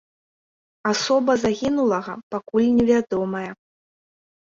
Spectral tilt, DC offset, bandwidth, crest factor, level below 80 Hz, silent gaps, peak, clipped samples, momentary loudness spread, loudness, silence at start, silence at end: -5 dB/octave; under 0.1%; 7.8 kHz; 16 dB; -56 dBFS; 2.23-2.30 s; -6 dBFS; under 0.1%; 12 LU; -21 LUFS; 0.85 s; 0.85 s